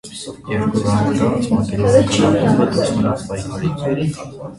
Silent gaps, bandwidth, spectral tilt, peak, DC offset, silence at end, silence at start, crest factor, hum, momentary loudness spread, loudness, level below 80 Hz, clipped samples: none; 11.5 kHz; -6.5 dB/octave; 0 dBFS; under 0.1%; 0 s; 0.05 s; 16 dB; none; 10 LU; -17 LUFS; -40 dBFS; under 0.1%